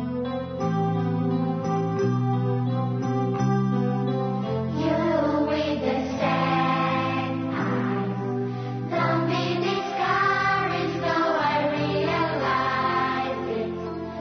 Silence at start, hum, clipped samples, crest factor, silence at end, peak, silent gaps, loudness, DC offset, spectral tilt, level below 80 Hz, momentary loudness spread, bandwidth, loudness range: 0 s; none; under 0.1%; 14 dB; 0 s; -10 dBFS; none; -25 LUFS; under 0.1%; -7 dB/octave; -60 dBFS; 6 LU; 6.6 kHz; 2 LU